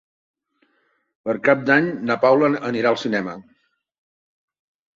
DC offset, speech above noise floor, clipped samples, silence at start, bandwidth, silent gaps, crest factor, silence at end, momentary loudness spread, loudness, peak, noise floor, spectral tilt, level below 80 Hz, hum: under 0.1%; 48 dB; under 0.1%; 1.25 s; 7.6 kHz; none; 20 dB; 1.55 s; 14 LU; -19 LUFS; -2 dBFS; -67 dBFS; -6.5 dB/octave; -66 dBFS; none